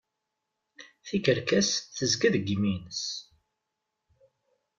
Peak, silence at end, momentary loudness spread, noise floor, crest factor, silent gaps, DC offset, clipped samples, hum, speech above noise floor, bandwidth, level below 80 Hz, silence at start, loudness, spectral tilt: -10 dBFS; 1.55 s; 10 LU; -84 dBFS; 20 dB; none; under 0.1%; under 0.1%; none; 56 dB; 7.8 kHz; -64 dBFS; 0.8 s; -27 LUFS; -4 dB/octave